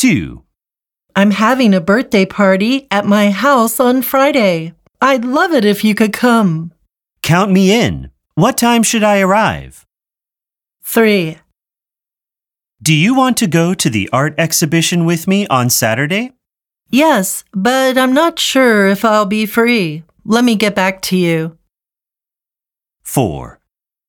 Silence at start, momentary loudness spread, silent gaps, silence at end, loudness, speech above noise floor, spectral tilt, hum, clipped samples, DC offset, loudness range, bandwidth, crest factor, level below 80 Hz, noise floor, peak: 0 s; 9 LU; none; 0.55 s; -12 LUFS; 77 dB; -4.5 dB/octave; none; under 0.1%; under 0.1%; 5 LU; 19 kHz; 14 dB; -46 dBFS; -89 dBFS; 0 dBFS